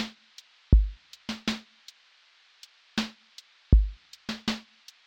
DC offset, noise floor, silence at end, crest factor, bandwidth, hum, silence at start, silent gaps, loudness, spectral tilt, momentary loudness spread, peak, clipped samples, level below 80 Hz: under 0.1%; -61 dBFS; 0.5 s; 24 dB; 8.6 kHz; none; 0 s; none; -30 LUFS; -5.5 dB/octave; 26 LU; -6 dBFS; under 0.1%; -30 dBFS